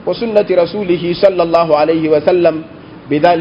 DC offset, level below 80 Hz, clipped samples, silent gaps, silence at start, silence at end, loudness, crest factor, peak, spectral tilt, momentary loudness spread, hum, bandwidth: under 0.1%; -48 dBFS; 0.3%; none; 0 s; 0 s; -13 LUFS; 12 dB; 0 dBFS; -8 dB/octave; 6 LU; none; 6.4 kHz